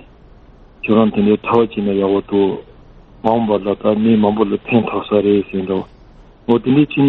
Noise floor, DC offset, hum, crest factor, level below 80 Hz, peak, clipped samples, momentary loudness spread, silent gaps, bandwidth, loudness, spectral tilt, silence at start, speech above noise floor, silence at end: -43 dBFS; under 0.1%; none; 16 dB; -46 dBFS; 0 dBFS; under 0.1%; 9 LU; none; 4.2 kHz; -16 LUFS; -6.5 dB/octave; 0.85 s; 28 dB; 0 s